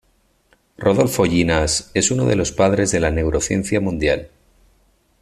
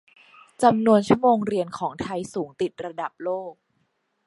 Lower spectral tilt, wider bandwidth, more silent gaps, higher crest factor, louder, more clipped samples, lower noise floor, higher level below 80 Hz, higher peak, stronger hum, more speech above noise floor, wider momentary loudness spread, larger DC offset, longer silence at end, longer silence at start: second, -4.5 dB/octave vs -6.5 dB/octave; first, 13.5 kHz vs 11.5 kHz; neither; about the same, 18 dB vs 20 dB; first, -18 LUFS vs -23 LUFS; neither; second, -61 dBFS vs -71 dBFS; first, -36 dBFS vs -62 dBFS; about the same, -2 dBFS vs -4 dBFS; neither; second, 43 dB vs 49 dB; second, 4 LU vs 14 LU; neither; first, 0.95 s vs 0.75 s; first, 0.8 s vs 0.6 s